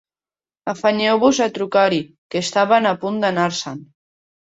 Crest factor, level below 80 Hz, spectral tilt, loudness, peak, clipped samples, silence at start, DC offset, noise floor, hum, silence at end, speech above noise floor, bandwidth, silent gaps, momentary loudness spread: 18 dB; -64 dBFS; -4 dB/octave; -18 LUFS; -2 dBFS; under 0.1%; 0.65 s; under 0.1%; under -90 dBFS; none; 0.75 s; over 72 dB; 8.2 kHz; 2.18-2.30 s; 12 LU